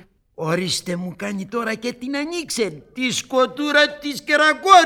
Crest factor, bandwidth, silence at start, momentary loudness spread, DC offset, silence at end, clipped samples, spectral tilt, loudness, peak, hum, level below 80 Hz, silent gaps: 20 dB; 18 kHz; 0.4 s; 11 LU; under 0.1%; 0 s; under 0.1%; -3 dB/octave; -20 LUFS; 0 dBFS; none; -58 dBFS; none